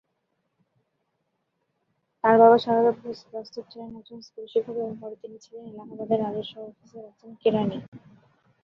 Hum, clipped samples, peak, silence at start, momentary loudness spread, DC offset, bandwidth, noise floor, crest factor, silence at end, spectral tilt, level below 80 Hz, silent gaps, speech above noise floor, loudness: none; under 0.1%; -4 dBFS; 2.25 s; 26 LU; under 0.1%; 6.6 kHz; -76 dBFS; 24 dB; 0.65 s; -7.5 dB/octave; -70 dBFS; 7.88-7.92 s; 51 dB; -23 LUFS